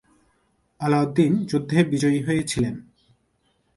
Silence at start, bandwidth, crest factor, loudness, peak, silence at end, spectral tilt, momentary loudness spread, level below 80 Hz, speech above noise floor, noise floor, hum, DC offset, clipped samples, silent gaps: 0.8 s; 11.5 kHz; 20 dB; -22 LUFS; -4 dBFS; 0.95 s; -6.5 dB/octave; 8 LU; -52 dBFS; 47 dB; -68 dBFS; none; under 0.1%; under 0.1%; none